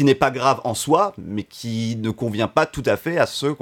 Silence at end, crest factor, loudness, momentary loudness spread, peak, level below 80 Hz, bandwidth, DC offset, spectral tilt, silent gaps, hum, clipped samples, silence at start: 0.05 s; 20 dB; -21 LUFS; 10 LU; -2 dBFS; -50 dBFS; 17.5 kHz; under 0.1%; -5 dB/octave; none; none; under 0.1%; 0 s